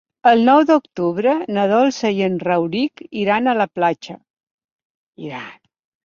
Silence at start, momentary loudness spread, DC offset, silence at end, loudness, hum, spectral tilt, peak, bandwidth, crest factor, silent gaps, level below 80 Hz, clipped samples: 0.25 s; 18 LU; under 0.1%; 0.5 s; -17 LUFS; none; -6 dB/octave; -2 dBFS; 7.4 kHz; 16 dB; 4.30-4.34 s, 4.51-4.58 s, 4.64-5.13 s; -64 dBFS; under 0.1%